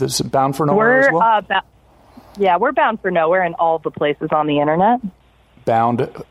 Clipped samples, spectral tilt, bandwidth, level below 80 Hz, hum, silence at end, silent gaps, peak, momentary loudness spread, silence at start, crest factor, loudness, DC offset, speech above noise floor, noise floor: under 0.1%; -5 dB/octave; 15.5 kHz; -54 dBFS; none; 0.1 s; none; -2 dBFS; 8 LU; 0 s; 14 dB; -16 LUFS; under 0.1%; 30 dB; -46 dBFS